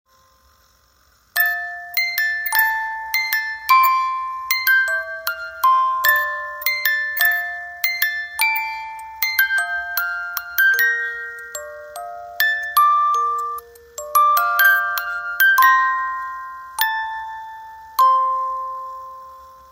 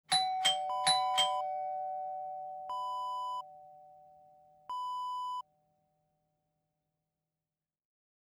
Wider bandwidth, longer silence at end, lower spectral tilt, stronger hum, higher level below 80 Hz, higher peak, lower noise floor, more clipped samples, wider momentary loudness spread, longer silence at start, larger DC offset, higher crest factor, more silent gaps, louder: second, 16.5 kHz vs 19.5 kHz; second, 0.1 s vs 2.85 s; second, 2.5 dB/octave vs 0.5 dB/octave; neither; first, -62 dBFS vs -86 dBFS; first, 0 dBFS vs -16 dBFS; second, -57 dBFS vs under -90 dBFS; neither; first, 18 LU vs 14 LU; first, 1.35 s vs 0.1 s; neither; about the same, 20 dB vs 22 dB; neither; first, -18 LUFS vs -34 LUFS